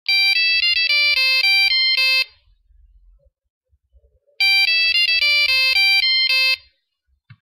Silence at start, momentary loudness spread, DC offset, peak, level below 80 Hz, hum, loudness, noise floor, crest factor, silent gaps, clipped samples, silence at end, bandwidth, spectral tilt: 0.1 s; 4 LU; under 0.1%; -6 dBFS; -58 dBFS; none; -14 LUFS; -69 dBFS; 12 dB; 3.50-3.61 s; under 0.1%; 0.9 s; 15.5 kHz; 3 dB/octave